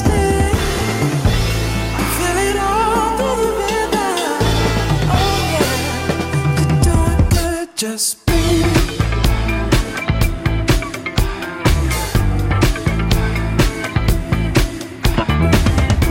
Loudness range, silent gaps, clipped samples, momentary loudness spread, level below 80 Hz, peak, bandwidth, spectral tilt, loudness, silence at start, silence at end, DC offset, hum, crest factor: 2 LU; none; under 0.1%; 4 LU; -22 dBFS; -4 dBFS; 16.5 kHz; -5 dB/octave; -17 LUFS; 0 s; 0 s; under 0.1%; none; 12 dB